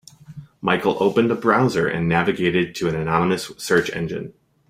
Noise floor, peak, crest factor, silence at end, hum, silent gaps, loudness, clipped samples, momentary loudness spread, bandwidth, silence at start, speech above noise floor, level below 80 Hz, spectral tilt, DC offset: -41 dBFS; -2 dBFS; 18 dB; 0.4 s; none; none; -20 LUFS; under 0.1%; 9 LU; 16 kHz; 0.3 s; 21 dB; -52 dBFS; -6 dB/octave; under 0.1%